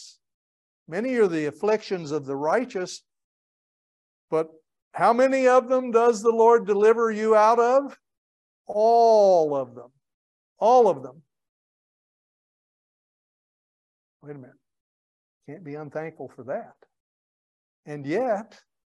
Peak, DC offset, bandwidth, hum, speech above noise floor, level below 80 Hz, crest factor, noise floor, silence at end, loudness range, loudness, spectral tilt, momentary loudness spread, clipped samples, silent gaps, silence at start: -6 dBFS; under 0.1%; 10.5 kHz; none; over 68 dB; -80 dBFS; 18 dB; under -90 dBFS; 0.5 s; 19 LU; -21 LUFS; -5.5 dB/octave; 20 LU; under 0.1%; 0.34-0.86 s, 3.24-4.28 s, 4.82-4.91 s, 8.18-8.65 s, 10.14-10.56 s, 11.49-14.20 s, 14.80-15.41 s, 17.00-17.83 s; 0 s